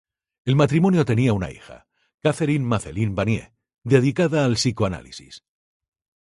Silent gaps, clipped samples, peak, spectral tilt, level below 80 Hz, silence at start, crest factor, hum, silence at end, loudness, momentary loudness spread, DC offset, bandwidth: 2.14-2.18 s; under 0.1%; -2 dBFS; -6.5 dB/octave; -46 dBFS; 0.45 s; 20 dB; none; 0.85 s; -21 LUFS; 16 LU; under 0.1%; 11.5 kHz